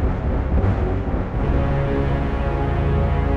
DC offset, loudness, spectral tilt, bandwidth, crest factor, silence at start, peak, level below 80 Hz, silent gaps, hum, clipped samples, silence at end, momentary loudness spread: under 0.1%; -22 LUFS; -9.5 dB/octave; 5.6 kHz; 12 dB; 0 s; -6 dBFS; -22 dBFS; none; none; under 0.1%; 0 s; 3 LU